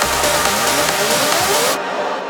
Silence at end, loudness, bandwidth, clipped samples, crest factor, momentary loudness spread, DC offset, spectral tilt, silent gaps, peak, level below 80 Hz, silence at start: 0 s; -15 LUFS; over 20 kHz; under 0.1%; 16 dB; 4 LU; under 0.1%; -1.5 dB/octave; none; -2 dBFS; -42 dBFS; 0 s